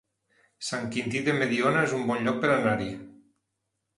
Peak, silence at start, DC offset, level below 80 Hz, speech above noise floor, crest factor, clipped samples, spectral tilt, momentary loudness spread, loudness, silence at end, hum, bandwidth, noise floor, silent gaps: -10 dBFS; 0.6 s; under 0.1%; -62 dBFS; 54 dB; 18 dB; under 0.1%; -5 dB/octave; 11 LU; -27 LUFS; 0.85 s; none; 11.5 kHz; -81 dBFS; none